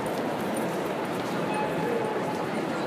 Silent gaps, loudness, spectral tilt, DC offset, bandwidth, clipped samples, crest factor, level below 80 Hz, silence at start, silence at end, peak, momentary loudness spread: none; -29 LUFS; -5.5 dB/octave; under 0.1%; 15.5 kHz; under 0.1%; 12 dB; -66 dBFS; 0 s; 0 s; -16 dBFS; 2 LU